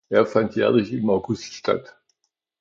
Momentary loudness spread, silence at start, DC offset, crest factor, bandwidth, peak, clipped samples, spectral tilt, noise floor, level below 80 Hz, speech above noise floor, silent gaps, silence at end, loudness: 7 LU; 0.1 s; under 0.1%; 18 dB; 7.6 kHz; -4 dBFS; under 0.1%; -6.5 dB/octave; -75 dBFS; -58 dBFS; 54 dB; none; 0.8 s; -22 LUFS